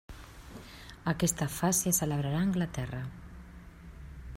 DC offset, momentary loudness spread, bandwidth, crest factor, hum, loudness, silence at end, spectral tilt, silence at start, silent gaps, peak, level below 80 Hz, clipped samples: under 0.1%; 22 LU; 16 kHz; 22 dB; none; -30 LUFS; 0 s; -4.5 dB/octave; 0.1 s; none; -12 dBFS; -50 dBFS; under 0.1%